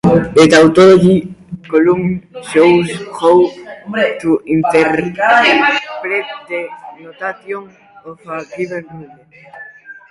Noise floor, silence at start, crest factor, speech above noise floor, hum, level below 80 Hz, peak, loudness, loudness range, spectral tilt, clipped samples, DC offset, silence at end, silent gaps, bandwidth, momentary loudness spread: -36 dBFS; 0.05 s; 14 dB; 23 dB; none; -48 dBFS; 0 dBFS; -12 LUFS; 15 LU; -6 dB/octave; under 0.1%; under 0.1%; 0.2 s; none; 11.5 kHz; 20 LU